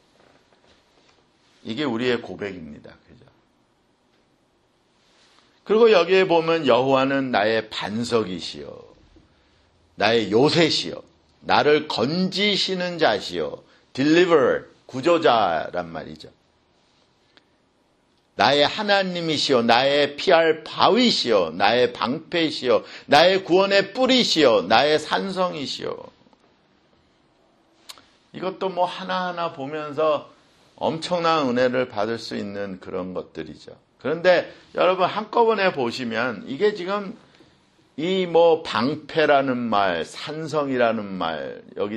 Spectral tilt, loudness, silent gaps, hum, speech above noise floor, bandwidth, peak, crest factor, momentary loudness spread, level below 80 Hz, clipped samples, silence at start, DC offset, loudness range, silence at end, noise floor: -4.5 dB/octave; -21 LUFS; none; none; 43 dB; 11 kHz; 0 dBFS; 22 dB; 15 LU; -62 dBFS; under 0.1%; 1.65 s; under 0.1%; 12 LU; 0 s; -64 dBFS